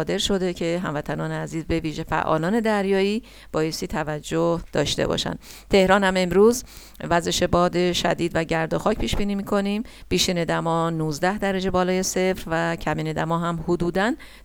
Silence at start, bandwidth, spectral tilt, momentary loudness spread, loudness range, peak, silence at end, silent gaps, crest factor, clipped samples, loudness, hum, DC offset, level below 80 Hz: 0 s; 19 kHz; -5 dB/octave; 8 LU; 4 LU; -4 dBFS; 0.05 s; none; 20 dB; under 0.1%; -23 LUFS; none; under 0.1%; -40 dBFS